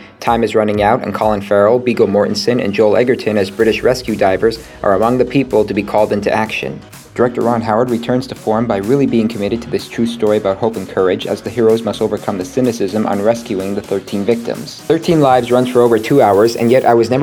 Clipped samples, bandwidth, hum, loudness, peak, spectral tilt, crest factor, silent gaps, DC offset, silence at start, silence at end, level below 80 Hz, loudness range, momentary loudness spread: under 0.1%; 19 kHz; none; -14 LUFS; 0 dBFS; -6 dB/octave; 14 dB; none; under 0.1%; 0 s; 0 s; -44 dBFS; 3 LU; 8 LU